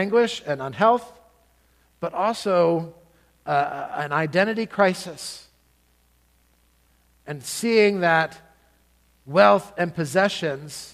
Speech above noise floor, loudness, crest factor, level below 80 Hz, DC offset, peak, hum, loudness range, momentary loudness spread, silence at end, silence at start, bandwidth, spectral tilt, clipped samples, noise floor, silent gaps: 40 dB; -22 LUFS; 22 dB; -64 dBFS; under 0.1%; -2 dBFS; none; 6 LU; 15 LU; 0.05 s; 0 s; 15.5 kHz; -5 dB/octave; under 0.1%; -62 dBFS; none